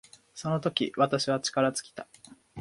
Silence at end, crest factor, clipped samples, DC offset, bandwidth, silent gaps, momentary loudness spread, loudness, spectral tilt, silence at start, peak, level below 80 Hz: 0 s; 20 dB; under 0.1%; under 0.1%; 11.5 kHz; none; 21 LU; -28 LUFS; -4.5 dB/octave; 0.35 s; -10 dBFS; -68 dBFS